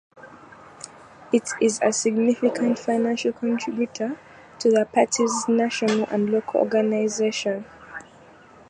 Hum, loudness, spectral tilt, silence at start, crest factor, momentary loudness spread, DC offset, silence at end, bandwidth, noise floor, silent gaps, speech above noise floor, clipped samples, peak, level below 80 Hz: none; -23 LUFS; -4 dB/octave; 0.15 s; 18 dB; 18 LU; under 0.1%; 0.65 s; 11 kHz; -49 dBFS; none; 27 dB; under 0.1%; -4 dBFS; -68 dBFS